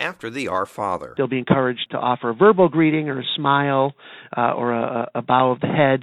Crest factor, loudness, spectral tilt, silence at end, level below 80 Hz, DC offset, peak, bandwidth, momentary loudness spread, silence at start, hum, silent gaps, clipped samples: 18 dB; -20 LUFS; -7 dB/octave; 0 s; -60 dBFS; under 0.1%; -2 dBFS; 12 kHz; 9 LU; 0 s; none; none; under 0.1%